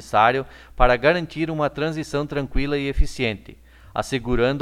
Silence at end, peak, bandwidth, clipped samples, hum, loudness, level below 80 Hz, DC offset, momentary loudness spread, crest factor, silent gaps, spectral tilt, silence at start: 0 s; -2 dBFS; 13 kHz; under 0.1%; none; -22 LUFS; -30 dBFS; under 0.1%; 10 LU; 20 dB; none; -6 dB/octave; 0 s